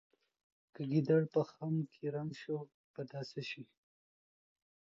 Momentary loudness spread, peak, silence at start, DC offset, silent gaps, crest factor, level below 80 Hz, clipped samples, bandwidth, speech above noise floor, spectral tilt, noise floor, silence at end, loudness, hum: 17 LU; -20 dBFS; 0.8 s; under 0.1%; 2.74-2.94 s; 18 dB; -84 dBFS; under 0.1%; 7.4 kHz; over 53 dB; -7 dB/octave; under -90 dBFS; 1.15 s; -38 LUFS; none